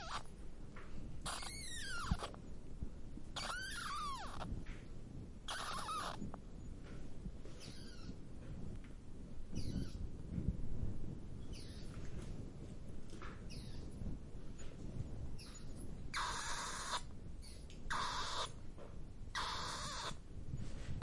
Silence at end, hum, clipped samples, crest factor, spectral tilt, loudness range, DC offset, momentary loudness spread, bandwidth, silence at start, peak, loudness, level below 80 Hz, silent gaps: 0 s; none; under 0.1%; 22 dB; -3.5 dB/octave; 7 LU; under 0.1%; 12 LU; 11.5 kHz; 0 s; -22 dBFS; -47 LUFS; -50 dBFS; none